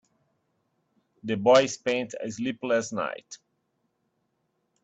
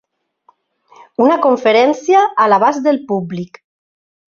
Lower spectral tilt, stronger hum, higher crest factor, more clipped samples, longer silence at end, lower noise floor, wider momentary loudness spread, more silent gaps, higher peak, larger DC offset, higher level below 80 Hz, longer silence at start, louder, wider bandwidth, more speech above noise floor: second, -4 dB/octave vs -5.5 dB/octave; neither; first, 24 dB vs 14 dB; neither; first, 1.5 s vs 0.85 s; first, -76 dBFS vs -55 dBFS; about the same, 14 LU vs 15 LU; neither; about the same, -4 dBFS vs -2 dBFS; neither; second, -72 dBFS vs -64 dBFS; about the same, 1.25 s vs 1.2 s; second, -26 LUFS vs -13 LUFS; first, 8.2 kHz vs 7.4 kHz; first, 50 dB vs 43 dB